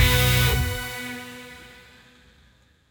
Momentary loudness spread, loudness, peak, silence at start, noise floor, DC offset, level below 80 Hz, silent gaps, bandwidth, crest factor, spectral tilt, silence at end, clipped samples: 23 LU; -22 LUFS; -6 dBFS; 0 s; -58 dBFS; under 0.1%; -32 dBFS; none; 19.5 kHz; 18 dB; -3.5 dB/octave; 1.25 s; under 0.1%